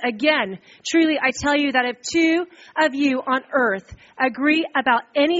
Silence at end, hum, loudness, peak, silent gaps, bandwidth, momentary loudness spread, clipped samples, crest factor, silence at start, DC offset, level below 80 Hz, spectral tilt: 0 s; none; -20 LUFS; -4 dBFS; none; 8 kHz; 5 LU; under 0.1%; 18 dB; 0 s; under 0.1%; -56 dBFS; -1 dB/octave